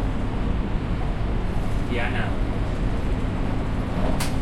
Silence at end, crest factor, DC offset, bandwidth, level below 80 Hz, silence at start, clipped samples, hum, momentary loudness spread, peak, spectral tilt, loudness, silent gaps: 0 s; 12 dB; under 0.1%; 14.5 kHz; -26 dBFS; 0 s; under 0.1%; none; 2 LU; -10 dBFS; -6.5 dB/octave; -27 LUFS; none